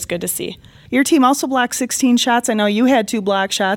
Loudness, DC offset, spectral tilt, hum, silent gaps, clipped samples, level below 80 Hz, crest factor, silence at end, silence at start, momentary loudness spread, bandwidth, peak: -16 LUFS; under 0.1%; -3 dB/octave; none; none; under 0.1%; -54 dBFS; 14 dB; 0 s; 0 s; 7 LU; 18 kHz; -2 dBFS